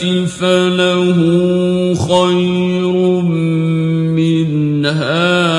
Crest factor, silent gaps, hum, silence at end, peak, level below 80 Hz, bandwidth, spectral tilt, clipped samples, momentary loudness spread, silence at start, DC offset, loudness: 12 dB; none; none; 0 s; 0 dBFS; -52 dBFS; 11 kHz; -6.5 dB/octave; under 0.1%; 3 LU; 0 s; under 0.1%; -13 LUFS